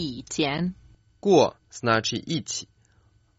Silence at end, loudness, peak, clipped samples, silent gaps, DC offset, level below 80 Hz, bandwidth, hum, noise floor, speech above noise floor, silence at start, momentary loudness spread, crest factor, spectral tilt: 0.75 s; -25 LUFS; -6 dBFS; under 0.1%; none; under 0.1%; -58 dBFS; 8 kHz; none; -61 dBFS; 37 dB; 0 s; 12 LU; 20 dB; -4 dB/octave